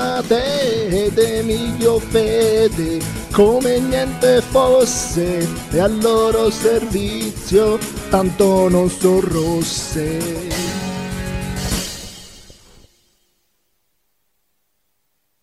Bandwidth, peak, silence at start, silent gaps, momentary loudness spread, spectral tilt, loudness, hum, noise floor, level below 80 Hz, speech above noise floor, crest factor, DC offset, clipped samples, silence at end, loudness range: 16 kHz; -2 dBFS; 0 s; none; 10 LU; -5 dB/octave; -17 LUFS; none; -70 dBFS; -34 dBFS; 54 dB; 16 dB; under 0.1%; under 0.1%; 2.9 s; 11 LU